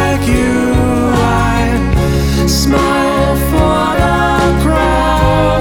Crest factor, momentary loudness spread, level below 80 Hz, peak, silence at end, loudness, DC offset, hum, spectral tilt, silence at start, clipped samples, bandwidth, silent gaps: 10 dB; 2 LU; -18 dBFS; 0 dBFS; 0 s; -12 LUFS; under 0.1%; none; -5.5 dB/octave; 0 s; under 0.1%; 18.5 kHz; none